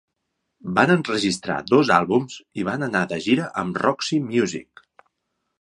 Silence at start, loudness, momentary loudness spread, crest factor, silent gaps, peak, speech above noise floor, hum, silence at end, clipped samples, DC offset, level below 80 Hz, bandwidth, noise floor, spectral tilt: 0.65 s; -21 LUFS; 9 LU; 22 dB; none; -2 dBFS; 56 dB; none; 0.95 s; under 0.1%; under 0.1%; -60 dBFS; 11 kHz; -77 dBFS; -5 dB/octave